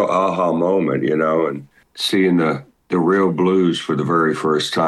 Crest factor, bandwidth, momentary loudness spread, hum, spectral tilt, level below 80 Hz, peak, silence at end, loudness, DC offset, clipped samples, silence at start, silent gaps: 12 dB; 12.5 kHz; 7 LU; none; -6 dB/octave; -64 dBFS; -6 dBFS; 0 s; -18 LUFS; under 0.1%; under 0.1%; 0 s; none